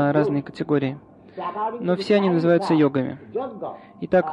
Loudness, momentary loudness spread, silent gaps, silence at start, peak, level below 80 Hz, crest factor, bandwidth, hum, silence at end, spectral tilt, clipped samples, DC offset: -22 LUFS; 16 LU; none; 0 s; -6 dBFS; -60 dBFS; 16 dB; 10.5 kHz; none; 0 s; -8 dB/octave; under 0.1%; under 0.1%